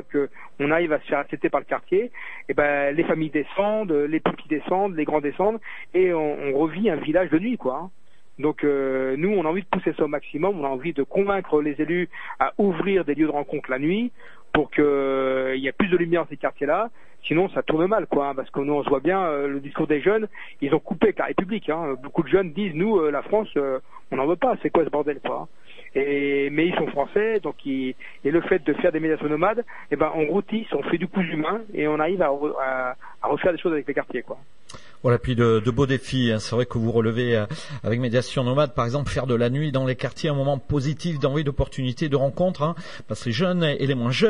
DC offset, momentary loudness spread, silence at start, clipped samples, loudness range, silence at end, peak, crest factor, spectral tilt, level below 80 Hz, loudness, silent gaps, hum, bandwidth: 1%; 7 LU; 0 s; under 0.1%; 2 LU; 0 s; -4 dBFS; 20 dB; -7 dB/octave; -48 dBFS; -24 LUFS; none; none; 11 kHz